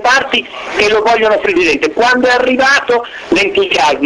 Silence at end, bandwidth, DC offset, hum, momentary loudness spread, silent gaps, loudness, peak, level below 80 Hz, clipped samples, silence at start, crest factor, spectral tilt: 0 s; 12 kHz; under 0.1%; none; 6 LU; none; -11 LUFS; 0 dBFS; -44 dBFS; under 0.1%; 0 s; 12 dB; -2.5 dB/octave